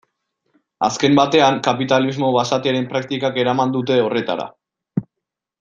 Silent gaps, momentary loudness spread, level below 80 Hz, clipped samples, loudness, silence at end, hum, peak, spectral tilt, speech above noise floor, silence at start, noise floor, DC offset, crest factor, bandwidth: none; 13 LU; -60 dBFS; under 0.1%; -18 LUFS; 0.6 s; none; -2 dBFS; -5 dB/octave; 65 dB; 0.8 s; -82 dBFS; under 0.1%; 18 dB; 7.6 kHz